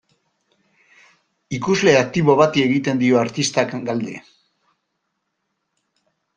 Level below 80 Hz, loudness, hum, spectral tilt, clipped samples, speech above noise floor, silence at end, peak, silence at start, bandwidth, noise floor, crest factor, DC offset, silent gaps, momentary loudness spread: -58 dBFS; -18 LUFS; none; -5 dB/octave; under 0.1%; 57 dB; 2.15 s; -2 dBFS; 1.5 s; 10 kHz; -75 dBFS; 20 dB; under 0.1%; none; 12 LU